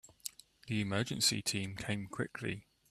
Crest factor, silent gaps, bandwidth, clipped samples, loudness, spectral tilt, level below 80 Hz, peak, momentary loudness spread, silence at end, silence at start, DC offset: 22 dB; none; 14.5 kHz; under 0.1%; -36 LUFS; -3.5 dB/octave; -66 dBFS; -16 dBFS; 16 LU; 0.3 s; 0.05 s; under 0.1%